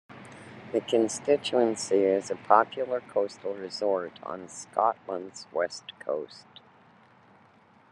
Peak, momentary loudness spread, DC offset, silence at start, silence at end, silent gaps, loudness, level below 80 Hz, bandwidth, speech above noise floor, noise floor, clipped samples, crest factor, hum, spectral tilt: -4 dBFS; 16 LU; under 0.1%; 0.1 s; 1.55 s; none; -28 LUFS; -80 dBFS; 11.5 kHz; 31 dB; -59 dBFS; under 0.1%; 26 dB; none; -4 dB/octave